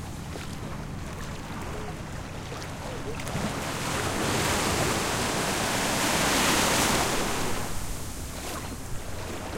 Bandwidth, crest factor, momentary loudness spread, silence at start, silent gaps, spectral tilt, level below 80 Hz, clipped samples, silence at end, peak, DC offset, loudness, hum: 16.5 kHz; 18 dB; 14 LU; 0 s; none; -3 dB/octave; -42 dBFS; under 0.1%; 0 s; -10 dBFS; under 0.1%; -28 LUFS; none